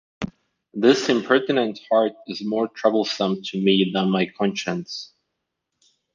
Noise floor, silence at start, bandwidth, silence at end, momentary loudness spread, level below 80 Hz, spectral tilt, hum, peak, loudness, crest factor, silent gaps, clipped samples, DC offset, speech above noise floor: -79 dBFS; 0.2 s; 7.6 kHz; 1.1 s; 15 LU; -62 dBFS; -5.5 dB/octave; none; -2 dBFS; -21 LUFS; 20 dB; none; under 0.1%; under 0.1%; 58 dB